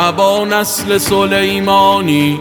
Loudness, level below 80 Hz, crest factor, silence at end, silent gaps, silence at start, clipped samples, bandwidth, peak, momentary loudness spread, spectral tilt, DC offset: -12 LUFS; -44 dBFS; 12 dB; 0 s; none; 0 s; under 0.1%; over 20 kHz; 0 dBFS; 4 LU; -4 dB/octave; under 0.1%